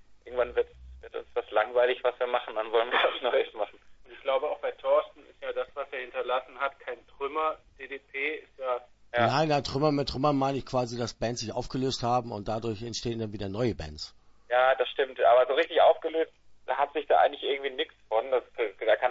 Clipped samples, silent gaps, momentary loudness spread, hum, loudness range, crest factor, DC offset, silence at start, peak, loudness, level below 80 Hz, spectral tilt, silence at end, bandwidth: under 0.1%; none; 13 LU; none; 6 LU; 18 dB; under 0.1%; 0.1 s; -10 dBFS; -29 LUFS; -54 dBFS; -5 dB/octave; 0 s; 8 kHz